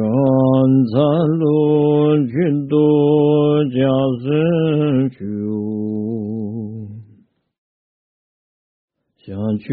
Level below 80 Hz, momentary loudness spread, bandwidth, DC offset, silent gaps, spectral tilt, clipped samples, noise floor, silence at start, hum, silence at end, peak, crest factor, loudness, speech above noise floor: -56 dBFS; 12 LU; 4.6 kHz; under 0.1%; 7.58-8.88 s; -8.5 dB/octave; under 0.1%; -52 dBFS; 0 s; none; 0 s; -4 dBFS; 14 dB; -16 LUFS; 38 dB